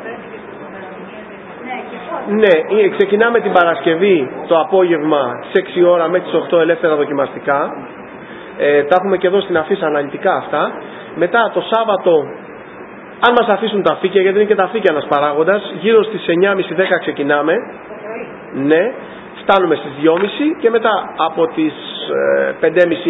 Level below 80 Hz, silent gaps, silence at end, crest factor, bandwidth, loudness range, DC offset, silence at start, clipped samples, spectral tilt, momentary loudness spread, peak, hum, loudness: -60 dBFS; none; 0 s; 14 dB; 4 kHz; 3 LU; under 0.1%; 0 s; under 0.1%; -8 dB/octave; 18 LU; 0 dBFS; none; -14 LUFS